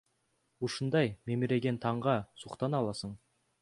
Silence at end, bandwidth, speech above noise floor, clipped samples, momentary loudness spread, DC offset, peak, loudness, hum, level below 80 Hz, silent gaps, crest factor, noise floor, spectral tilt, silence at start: 0.45 s; 11.5 kHz; 44 dB; under 0.1%; 12 LU; under 0.1%; -14 dBFS; -33 LUFS; none; -66 dBFS; none; 20 dB; -77 dBFS; -6.5 dB/octave; 0.6 s